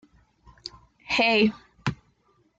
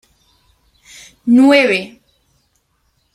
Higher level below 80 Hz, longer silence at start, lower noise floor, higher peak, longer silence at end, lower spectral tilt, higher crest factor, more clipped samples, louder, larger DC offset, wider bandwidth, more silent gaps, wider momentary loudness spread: about the same, -56 dBFS vs -60 dBFS; second, 0.65 s vs 1.25 s; about the same, -66 dBFS vs -63 dBFS; second, -10 dBFS vs -2 dBFS; second, 0.65 s vs 1.25 s; about the same, -5 dB/octave vs -4.5 dB/octave; about the same, 20 dB vs 16 dB; neither; second, -24 LUFS vs -12 LUFS; neither; second, 7.8 kHz vs 12.5 kHz; neither; first, 22 LU vs 18 LU